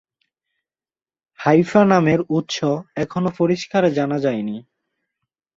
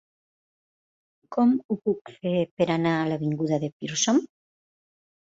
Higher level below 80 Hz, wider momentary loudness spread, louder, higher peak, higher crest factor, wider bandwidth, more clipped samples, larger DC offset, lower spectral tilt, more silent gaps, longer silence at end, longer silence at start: first, -58 dBFS vs -68 dBFS; first, 10 LU vs 7 LU; first, -19 LUFS vs -25 LUFS; first, -2 dBFS vs -10 dBFS; about the same, 18 dB vs 18 dB; about the same, 7.8 kHz vs 7.8 kHz; neither; neither; first, -6.5 dB/octave vs -5 dB/octave; second, none vs 1.65-1.69 s, 2.01-2.05 s, 2.51-2.57 s, 3.73-3.80 s; about the same, 0.95 s vs 1.05 s; about the same, 1.4 s vs 1.3 s